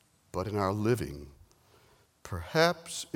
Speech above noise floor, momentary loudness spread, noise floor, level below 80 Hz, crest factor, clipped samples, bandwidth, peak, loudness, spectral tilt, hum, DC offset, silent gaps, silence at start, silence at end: 33 dB; 15 LU; -64 dBFS; -54 dBFS; 24 dB; under 0.1%; 17.5 kHz; -8 dBFS; -31 LUFS; -5 dB/octave; none; under 0.1%; none; 0.35 s; 0.1 s